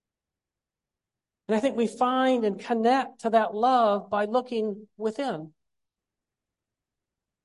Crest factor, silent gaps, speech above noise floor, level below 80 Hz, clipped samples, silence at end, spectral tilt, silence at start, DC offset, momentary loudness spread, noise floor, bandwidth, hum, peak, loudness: 18 dB; none; 64 dB; -74 dBFS; under 0.1%; 1.95 s; -5.5 dB/octave; 1.5 s; under 0.1%; 10 LU; -90 dBFS; 11.5 kHz; none; -10 dBFS; -26 LUFS